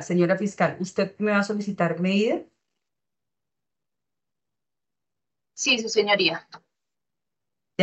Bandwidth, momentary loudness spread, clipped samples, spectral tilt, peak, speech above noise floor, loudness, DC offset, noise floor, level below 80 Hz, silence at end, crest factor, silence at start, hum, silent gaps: 8.4 kHz; 7 LU; under 0.1%; -4.5 dB/octave; -6 dBFS; 66 dB; -23 LUFS; under 0.1%; -89 dBFS; -76 dBFS; 0 s; 22 dB; 0 s; none; none